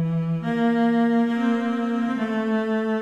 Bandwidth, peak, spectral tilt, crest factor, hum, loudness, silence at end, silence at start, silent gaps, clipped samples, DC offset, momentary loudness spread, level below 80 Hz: 7.4 kHz; -10 dBFS; -8 dB/octave; 12 dB; none; -23 LUFS; 0 s; 0 s; none; under 0.1%; under 0.1%; 4 LU; -62 dBFS